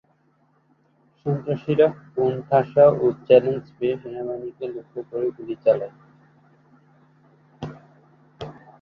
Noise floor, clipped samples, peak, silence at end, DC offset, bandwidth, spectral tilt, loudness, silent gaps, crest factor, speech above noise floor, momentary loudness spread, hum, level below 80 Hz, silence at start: -63 dBFS; under 0.1%; -2 dBFS; 0.3 s; under 0.1%; 6 kHz; -9.5 dB/octave; -22 LUFS; none; 22 dB; 42 dB; 21 LU; none; -62 dBFS; 1.25 s